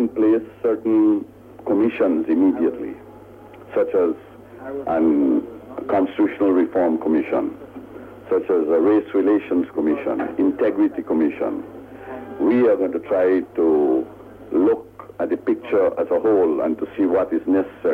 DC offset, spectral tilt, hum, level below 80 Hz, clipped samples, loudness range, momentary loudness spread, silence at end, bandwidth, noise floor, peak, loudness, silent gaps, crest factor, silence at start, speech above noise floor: under 0.1%; -8.5 dB/octave; none; -58 dBFS; under 0.1%; 2 LU; 16 LU; 0 s; 3.9 kHz; -42 dBFS; -8 dBFS; -20 LUFS; none; 12 dB; 0 s; 23 dB